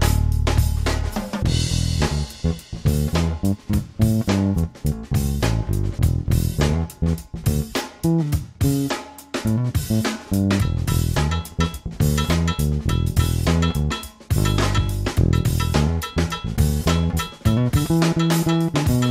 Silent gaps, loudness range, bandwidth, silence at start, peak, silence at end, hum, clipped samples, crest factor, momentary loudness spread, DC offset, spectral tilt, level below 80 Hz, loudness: none; 2 LU; 16 kHz; 0 s; -4 dBFS; 0 s; none; under 0.1%; 16 dB; 6 LU; under 0.1%; -6 dB/octave; -28 dBFS; -22 LUFS